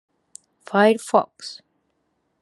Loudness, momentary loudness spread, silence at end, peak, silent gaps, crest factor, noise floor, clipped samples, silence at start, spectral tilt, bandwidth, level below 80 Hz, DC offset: -19 LUFS; 19 LU; 0.9 s; -2 dBFS; none; 22 dB; -71 dBFS; under 0.1%; 0.7 s; -5 dB/octave; 12.5 kHz; -78 dBFS; under 0.1%